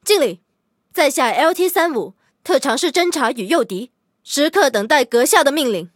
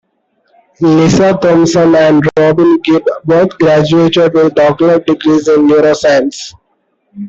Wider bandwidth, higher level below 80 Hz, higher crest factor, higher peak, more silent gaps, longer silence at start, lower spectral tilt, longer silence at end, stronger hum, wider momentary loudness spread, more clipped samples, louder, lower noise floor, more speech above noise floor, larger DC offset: first, 17.5 kHz vs 7.8 kHz; second, -70 dBFS vs -46 dBFS; first, 18 dB vs 8 dB; about the same, 0 dBFS vs -2 dBFS; neither; second, 0.05 s vs 0.8 s; second, -2 dB/octave vs -6 dB/octave; about the same, 0.1 s vs 0 s; neither; first, 12 LU vs 4 LU; neither; second, -16 LUFS vs -9 LUFS; second, -56 dBFS vs -60 dBFS; second, 40 dB vs 52 dB; neither